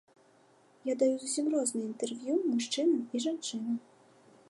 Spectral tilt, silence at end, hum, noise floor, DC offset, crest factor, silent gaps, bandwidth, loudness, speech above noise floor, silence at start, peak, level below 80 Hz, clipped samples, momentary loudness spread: -3 dB/octave; 0.7 s; none; -64 dBFS; under 0.1%; 18 dB; none; 11.5 kHz; -32 LUFS; 32 dB; 0.85 s; -16 dBFS; -88 dBFS; under 0.1%; 8 LU